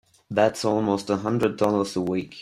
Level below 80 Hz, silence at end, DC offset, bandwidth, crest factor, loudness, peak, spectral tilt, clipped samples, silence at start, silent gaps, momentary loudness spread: -60 dBFS; 0 s; under 0.1%; 16 kHz; 18 dB; -24 LUFS; -6 dBFS; -6 dB/octave; under 0.1%; 0.3 s; none; 5 LU